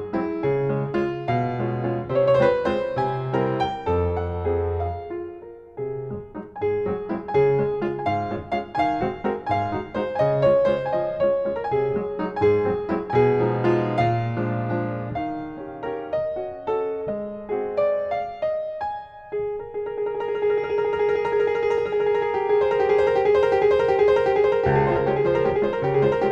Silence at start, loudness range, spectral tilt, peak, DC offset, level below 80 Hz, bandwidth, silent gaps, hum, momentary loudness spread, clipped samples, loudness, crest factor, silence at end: 0 s; 7 LU; -8.5 dB/octave; -6 dBFS; under 0.1%; -50 dBFS; 7 kHz; none; none; 11 LU; under 0.1%; -23 LUFS; 16 dB; 0 s